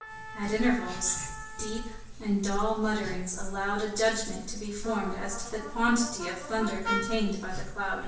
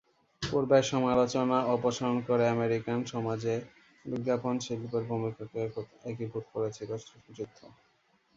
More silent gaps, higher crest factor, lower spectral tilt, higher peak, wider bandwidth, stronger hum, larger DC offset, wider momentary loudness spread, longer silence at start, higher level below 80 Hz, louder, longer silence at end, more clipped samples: neither; about the same, 16 dB vs 20 dB; second, -3.5 dB/octave vs -6 dB/octave; second, -14 dBFS vs -10 dBFS; about the same, 8 kHz vs 7.8 kHz; neither; neither; second, 10 LU vs 15 LU; second, 0 s vs 0.4 s; first, -46 dBFS vs -64 dBFS; about the same, -30 LUFS vs -31 LUFS; second, 0 s vs 0.7 s; neither